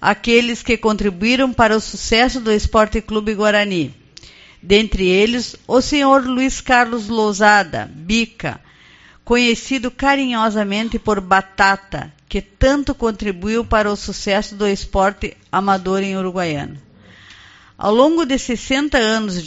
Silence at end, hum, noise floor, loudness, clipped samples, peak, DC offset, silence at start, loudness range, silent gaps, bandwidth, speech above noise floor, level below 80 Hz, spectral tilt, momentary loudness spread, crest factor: 0 s; none; -46 dBFS; -17 LUFS; under 0.1%; 0 dBFS; under 0.1%; 0 s; 4 LU; none; 8 kHz; 30 dB; -34 dBFS; -3 dB/octave; 9 LU; 18 dB